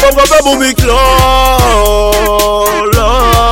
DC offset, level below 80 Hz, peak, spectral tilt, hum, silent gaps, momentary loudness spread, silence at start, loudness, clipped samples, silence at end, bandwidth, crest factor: under 0.1%; -16 dBFS; 0 dBFS; -4 dB/octave; none; none; 3 LU; 0 s; -8 LUFS; 0.2%; 0 s; 17.5 kHz; 8 dB